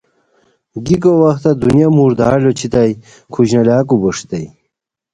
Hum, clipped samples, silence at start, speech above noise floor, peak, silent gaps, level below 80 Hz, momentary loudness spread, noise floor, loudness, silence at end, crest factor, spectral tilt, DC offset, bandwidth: none; under 0.1%; 0.75 s; 62 dB; 0 dBFS; none; -42 dBFS; 16 LU; -73 dBFS; -12 LUFS; 0.65 s; 14 dB; -7.5 dB/octave; under 0.1%; 10.5 kHz